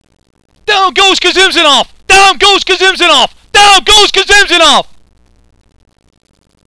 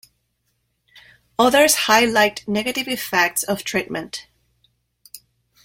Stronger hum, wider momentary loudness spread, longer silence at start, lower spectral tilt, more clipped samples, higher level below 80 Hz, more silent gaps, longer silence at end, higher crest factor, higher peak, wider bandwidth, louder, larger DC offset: neither; second, 6 LU vs 15 LU; second, 0.65 s vs 1.4 s; second, -0.5 dB/octave vs -2 dB/octave; first, 0.2% vs under 0.1%; first, -32 dBFS vs -56 dBFS; neither; first, 1.7 s vs 0.45 s; second, 8 dB vs 20 dB; about the same, 0 dBFS vs -2 dBFS; second, 11 kHz vs 16.5 kHz; first, -5 LUFS vs -18 LUFS; neither